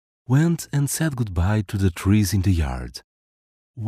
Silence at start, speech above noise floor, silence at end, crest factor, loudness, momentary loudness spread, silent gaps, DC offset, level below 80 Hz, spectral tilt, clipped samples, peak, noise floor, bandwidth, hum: 0.3 s; over 69 dB; 0 s; 16 dB; -22 LUFS; 9 LU; 3.04-3.74 s; under 0.1%; -38 dBFS; -6 dB/octave; under 0.1%; -6 dBFS; under -90 dBFS; 16 kHz; none